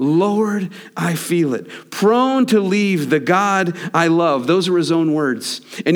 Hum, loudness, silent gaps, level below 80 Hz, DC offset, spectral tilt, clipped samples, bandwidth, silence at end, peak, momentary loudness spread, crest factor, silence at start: none; -17 LUFS; none; -74 dBFS; under 0.1%; -5.5 dB/octave; under 0.1%; over 20 kHz; 0 s; -2 dBFS; 9 LU; 14 dB; 0 s